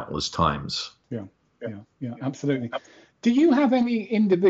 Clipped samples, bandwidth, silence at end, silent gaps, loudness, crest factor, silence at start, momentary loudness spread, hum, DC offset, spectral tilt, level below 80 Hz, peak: under 0.1%; 8 kHz; 0 s; none; -24 LUFS; 16 dB; 0 s; 17 LU; none; under 0.1%; -5 dB/octave; -50 dBFS; -8 dBFS